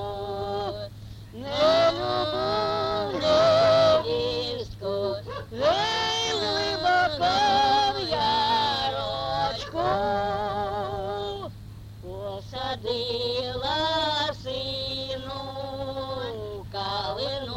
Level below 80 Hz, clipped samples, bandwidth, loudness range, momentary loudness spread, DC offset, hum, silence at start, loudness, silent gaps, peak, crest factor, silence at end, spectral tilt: -48 dBFS; under 0.1%; 16 kHz; 7 LU; 14 LU; under 0.1%; none; 0 s; -25 LUFS; none; -10 dBFS; 16 dB; 0 s; -4 dB/octave